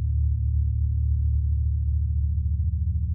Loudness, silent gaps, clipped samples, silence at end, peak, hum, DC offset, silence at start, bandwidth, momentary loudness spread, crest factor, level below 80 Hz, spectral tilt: -26 LUFS; none; under 0.1%; 0 s; -16 dBFS; none; under 0.1%; 0 s; 0.3 kHz; 2 LU; 8 dB; -24 dBFS; -29 dB/octave